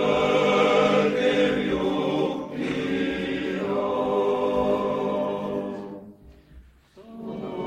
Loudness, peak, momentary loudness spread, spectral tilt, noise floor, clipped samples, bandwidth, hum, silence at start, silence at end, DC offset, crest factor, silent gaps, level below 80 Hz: -24 LUFS; -8 dBFS; 14 LU; -6 dB/octave; -50 dBFS; under 0.1%; 10 kHz; none; 0 s; 0 s; under 0.1%; 16 dB; none; -52 dBFS